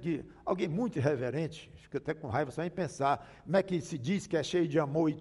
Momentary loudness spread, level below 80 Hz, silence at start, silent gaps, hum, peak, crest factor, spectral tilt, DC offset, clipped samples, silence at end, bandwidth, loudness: 7 LU; -64 dBFS; 0 s; none; none; -14 dBFS; 18 dB; -6.5 dB/octave; under 0.1%; under 0.1%; 0 s; 11.5 kHz; -33 LUFS